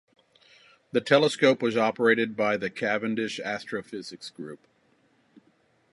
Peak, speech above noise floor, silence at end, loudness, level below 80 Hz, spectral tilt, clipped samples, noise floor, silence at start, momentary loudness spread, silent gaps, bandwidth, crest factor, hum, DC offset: -4 dBFS; 40 dB; 1.35 s; -25 LUFS; -74 dBFS; -5 dB/octave; under 0.1%; -66 dBFS; 0.95 s; 18 LU; none; 11.5 kHz; 24 dB; none; under 0.1%